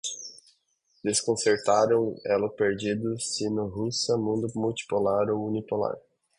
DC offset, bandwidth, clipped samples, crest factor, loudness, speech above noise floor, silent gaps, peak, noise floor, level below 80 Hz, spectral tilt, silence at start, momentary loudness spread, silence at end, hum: under 0.1%; 11 kHz; under 0.1%; 18 dB; -27 LUFS; 43 dB; none; -10 dBFS; -70 dBFS; -62 dBFS; -4 dB/octave; 0.05 s; 9 LU; 0.4 s; none